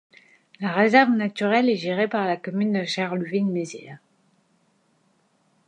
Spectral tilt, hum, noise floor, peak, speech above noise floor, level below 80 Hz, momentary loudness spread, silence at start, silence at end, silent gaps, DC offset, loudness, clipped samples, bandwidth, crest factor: -6 dB/octave; none; -65 dBFS; -4 dBFS; 43 dB; -76 dBFS; 11 LU; 0.6 s; 1.7 s; none; under 0.1%; -22 LUFS; under 0.1%; 9.8 kHz; 20 dB